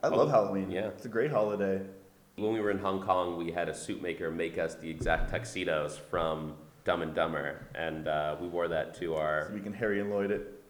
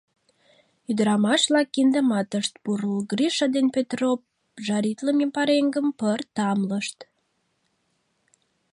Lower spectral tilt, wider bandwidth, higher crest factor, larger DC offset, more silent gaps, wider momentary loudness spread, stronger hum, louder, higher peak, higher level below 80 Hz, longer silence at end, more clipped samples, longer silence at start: first, -6 dB/octave vs -4.5 dB/octave; first, over 20 kHz vs 11.5 kHz; about the same, 20 dB vs 18 dB; neither; neither; about the same, 7 LU vs 8 LU; neither; second, -32 LUFS vs -23 LUFS; second, -12 dBFS vs -8 dBFS; first, -48 dBFS vs -74 dBFS; second, 0.1 s vs 1.7 s; neither; second, 0.05 s vs 0.9 s